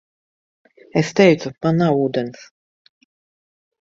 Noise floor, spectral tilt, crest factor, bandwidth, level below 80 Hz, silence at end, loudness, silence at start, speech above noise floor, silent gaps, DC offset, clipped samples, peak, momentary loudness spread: under -90 dBFS; -6.5 dB/octave; 20 dB; 7.8 kHz; -60 dBFS; 1.5 s; -18 LUFS; 0.95 s; over 73 dB; none; under 0.1%; under 0.1%; 0 dBFS; 10 LU